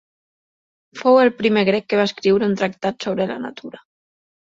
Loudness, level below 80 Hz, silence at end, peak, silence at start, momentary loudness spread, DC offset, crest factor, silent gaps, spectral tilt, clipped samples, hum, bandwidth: -18 LUFS; -62 dBFS; 0.8 s; -2 dBFS; 0.95 s; 15 LU; under 0.1%; 18 dB; none; -6 dB/octave; under 0.1%; none; 7.8 kHz